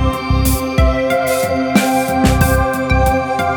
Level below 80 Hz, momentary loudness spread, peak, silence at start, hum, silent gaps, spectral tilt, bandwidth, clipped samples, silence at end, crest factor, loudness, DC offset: -20 dBFS; 3 LU; 0 dBFS; 0 s; none; none; -5.5 dB/octave; over 20 kHz; under 0.1%; 0 s; 14 dB; -15 LUFS; under 0.1%